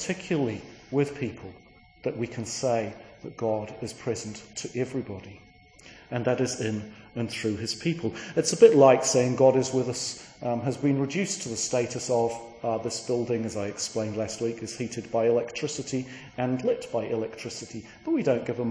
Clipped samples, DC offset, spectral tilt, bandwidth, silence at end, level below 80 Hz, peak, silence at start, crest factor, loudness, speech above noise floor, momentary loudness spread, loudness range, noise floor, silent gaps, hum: under 0.1%; under 0.1%; -5 dB/octave; 10.5 kHz; 0 s; -62 dBFS; -4 dBFS; 0 s; 24 dB; -27 LUFS; 25 dB; 15 LU; 10 LU; -52 dBFS; none; none